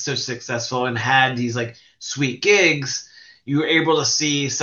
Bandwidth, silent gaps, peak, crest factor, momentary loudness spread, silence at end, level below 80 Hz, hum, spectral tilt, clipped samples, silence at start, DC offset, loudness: 7.6 kHz; none; -2 dBFS; 18 dB; 13 LU; 0 s; -64 dBFS; none; -3 dB/octave; under 0.1%; 0 s; under 0.1%; -19 LUFS